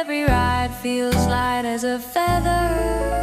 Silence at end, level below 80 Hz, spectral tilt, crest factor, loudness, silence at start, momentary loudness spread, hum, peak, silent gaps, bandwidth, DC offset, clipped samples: 0 s; -30 dBFS; -5.5 dB/octave; 16 dB; -21 LUFS; 0 s; 4 LU; none; -4 dBFS; none; 16 kHz; under 0.1%; under 0.1%